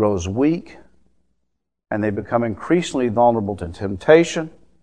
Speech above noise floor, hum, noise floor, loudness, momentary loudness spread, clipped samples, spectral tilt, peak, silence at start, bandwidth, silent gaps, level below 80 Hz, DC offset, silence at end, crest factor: 56 dB; none; -75 dBFS; -19 LUFS; 13 LU; under 0.1%; -6 dB/octave; 0 dBFS; 0 s; 10 kHz; none; -48 dBFS; 0.4%; 0.35 s; 20 dB